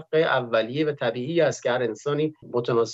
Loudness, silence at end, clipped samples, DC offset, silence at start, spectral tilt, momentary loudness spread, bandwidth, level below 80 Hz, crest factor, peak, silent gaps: -24 LUFS; 0 s; under 0.1%; under 0.1%; 0 s; -5.5 dB/octave; 5 LU; 8 kHz; -74 dBFS; 16 dB; -8 dBFS; none